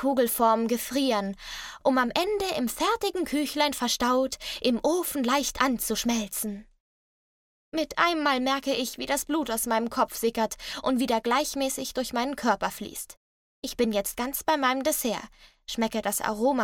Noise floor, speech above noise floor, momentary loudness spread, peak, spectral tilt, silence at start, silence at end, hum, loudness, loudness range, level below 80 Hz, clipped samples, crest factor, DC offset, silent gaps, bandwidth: under -90 dBFS; over 63 dB; 8 LU; -8 dBFS; -2.5 dB/octave; 0 s; 0 s; none; -27 LUFS; 3 LU; -54 dBFS; under 0.1%; 20 dB; under 0.1%; 6.80-7.72 s, 13.17-13.62 s; 17.5 kHz